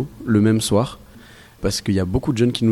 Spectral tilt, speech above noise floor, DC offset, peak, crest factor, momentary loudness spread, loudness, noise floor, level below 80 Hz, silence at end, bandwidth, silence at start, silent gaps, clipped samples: -6 dB/octave; 26 dB; under 0.1%; -4 dBFS; 16 dB; 8 LU; -20 LUFS; -44 dBFS; -40 dBFS; 0 s; 15 kHz; 0 s; none; under 0.1%